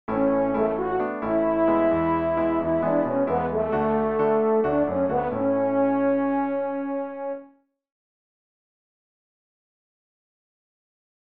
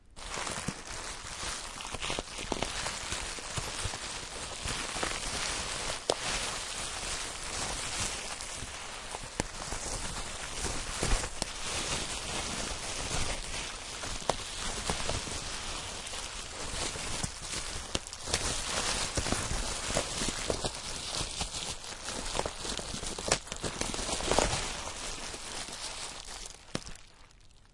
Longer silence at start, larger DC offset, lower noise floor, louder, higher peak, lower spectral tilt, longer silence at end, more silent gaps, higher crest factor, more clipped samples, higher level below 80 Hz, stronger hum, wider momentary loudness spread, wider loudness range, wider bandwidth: about the same, 0.1 s vs 0.1 s; first, 0.3% vs under 0.1%; about the same, -55 dBFS vs -56 dBFS; first, -23 LUFS vs -34 LUFS; about the same, -10 dBFS vs -10 dBFS; first, -11 dB/octave vs -2 dB/octave; first, 3.85 s vs 0.05 s; neither; second, 14 dB vs 26 dB; neither; second, -52 dBFS vs -44 dBFS; neither; about the same, 6 LU vs 7 LU; first, 11 LU vs 3 LU; second, 4.5 kHz vs 12 kHz